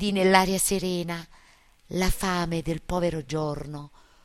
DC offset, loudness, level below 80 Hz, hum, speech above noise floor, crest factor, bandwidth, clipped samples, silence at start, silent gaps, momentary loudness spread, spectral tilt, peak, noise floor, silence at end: under 0.1%; -26 LUFS; -38 dBFS; none; 31 dB; 24 dB; 16 kHz; under 0.1%; 0 s; none; 15 LU; -4.5 dB/octave; -4 dBFS; -57 dBFS; 0.35 s